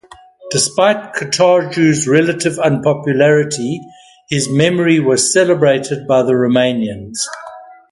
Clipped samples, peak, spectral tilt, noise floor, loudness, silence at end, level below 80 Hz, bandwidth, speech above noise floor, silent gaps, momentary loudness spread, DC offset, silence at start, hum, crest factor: under 0.1%; 0 dBFS; -4.5 dB/octave; -37 dBFS; -14 LUFS; 0.2 s; -54 dBFS; 11.5 kHz; 24 dB; none; 10 LU; under 0.1%; 0.4 s; none; 14 dB